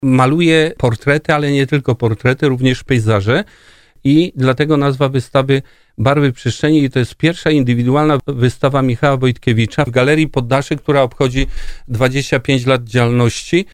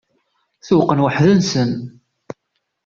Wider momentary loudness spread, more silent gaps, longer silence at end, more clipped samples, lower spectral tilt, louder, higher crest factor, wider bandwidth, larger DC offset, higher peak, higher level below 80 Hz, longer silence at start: second, 4 LU vs 24 LU; neither; second, 0.1 s vs 0.95 s; neither; about the same, -6.5 dB/octave vs -6.5 dB/octave; about the same, -14 LUFS vs -16 LUFS; about the same, 14 dB vs 16 dB; first, 13 kHz vs 7.4 kHz; neither; about the same, 0 dBFS vs -2 dBFS; first, -34 dBFS vs -52 dBFS; second, 0 s vs 0.65 s